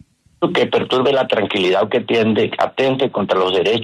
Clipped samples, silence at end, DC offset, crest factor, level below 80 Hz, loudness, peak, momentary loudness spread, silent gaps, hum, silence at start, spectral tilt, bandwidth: under 0.1%; 0 s; under 0.1%; 12 dB; -60 dBFS; -17 LUFS; -4 dBFS; 3 LU; none; none; 0.4 s; -6 dB/octave; 11 kHz